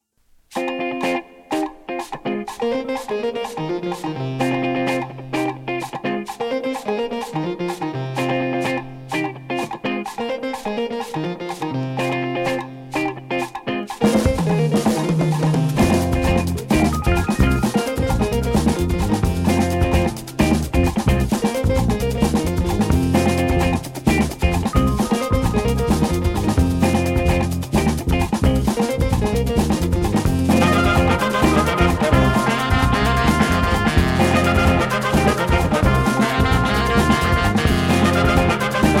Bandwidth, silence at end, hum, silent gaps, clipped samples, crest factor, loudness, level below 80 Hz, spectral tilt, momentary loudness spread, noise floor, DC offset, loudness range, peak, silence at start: 16.5 kHz; 0 s; none; none; under 0.1%; 16 dB; -19 LUFS; -28 dBFS; -6 dB/octave; 9 LU; -56 dBFS; under 0.1%; 7 LU; -2 dBFS; 0.5 s